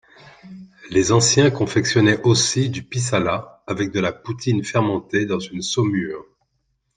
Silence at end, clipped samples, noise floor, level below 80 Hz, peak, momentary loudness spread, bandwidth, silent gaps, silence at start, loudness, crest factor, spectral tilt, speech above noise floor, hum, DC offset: 0.75 s; under 0.1%; -71 dBFS; -54 dBFS; -2 dBFS; 10 LU; 10 kHz; none; 0.25 s; -19 LUFS; 18 dB; -4.5 dB/octave; 51 dB; none; under 0.1%